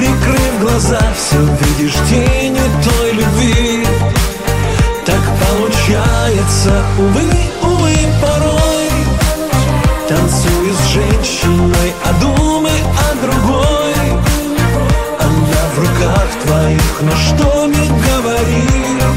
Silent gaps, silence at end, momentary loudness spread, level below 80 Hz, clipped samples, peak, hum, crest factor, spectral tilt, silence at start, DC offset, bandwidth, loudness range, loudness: none; 0 s; 2 LU; -18 dBFS; under 0.1%; 0 dBFS; none; 10 dB; -5 dB/octave; 0 s; 0.4%; 16.5 kHz; 1 LU; -12 LUFS